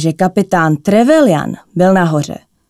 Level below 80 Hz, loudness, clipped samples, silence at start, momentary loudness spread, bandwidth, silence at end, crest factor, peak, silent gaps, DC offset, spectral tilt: -50 dBFS; -12 LUFS; under 0.1%; 0 s; 9 LU; 14 kHz; 0.35 s; 12 dB; 0 dBFS; none; under 0.1%; -6.5 dB/octave